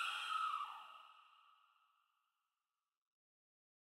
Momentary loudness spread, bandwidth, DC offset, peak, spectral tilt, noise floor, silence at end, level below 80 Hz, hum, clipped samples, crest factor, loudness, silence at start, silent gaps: 20 LU; 16 kHz; under 0.1%; -32 dBFS; 4 dB/octave; under -90 dBFS; 2.7 s; under -90 dBFS; none; under 0.1%; 18 dB; -42 LUFS; 0 s; none